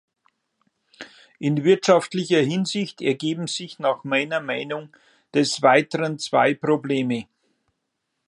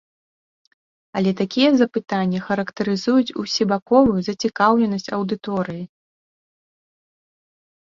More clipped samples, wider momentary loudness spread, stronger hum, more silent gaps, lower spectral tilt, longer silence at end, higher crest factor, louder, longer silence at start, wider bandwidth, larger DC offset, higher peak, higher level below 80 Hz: neither; first, 12 LU vs 9 LU; neither; second, none vs 3.82-3.86 s; about the same, -5 dB/octave vs -6 dB/octave; second, 1.05 s vs 1.95 s; about the same, 22 dB vs 20 dB; about the same, -22 LUFS vs -20 LUFS; second, 1 s vs 1.15 s; first, 11 kHz vs 7.6 kHz; neither; about the same, -2 dBFS vs -2 dBFS; second, -72 dBFS vs -54 dBFS